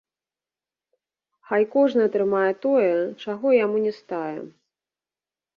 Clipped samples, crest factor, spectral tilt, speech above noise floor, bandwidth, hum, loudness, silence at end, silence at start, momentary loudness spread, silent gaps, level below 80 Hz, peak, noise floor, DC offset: under 0.1%; 16 dB; -7.5 dB/octave; over 68 dB; 6.6 kHz; none; -22 LUFS; 1.1 s; 1.5 s; 10 LU; none; -74 dBFS; -8 dBFS; under -90 dBFS; under 0.1%